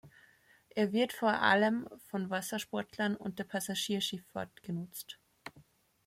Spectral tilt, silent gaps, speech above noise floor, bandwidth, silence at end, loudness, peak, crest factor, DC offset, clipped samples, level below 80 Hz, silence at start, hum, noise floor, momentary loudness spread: -4 dB/octave; none; 31 dB; 16.5 kHz; 0.45 s; -34 LUFS; -14 dBFS; 22 dB; under 0.1%; under 0.1%; -76 dBFS; 0.05 s; none; -65 dBFS; 18 LU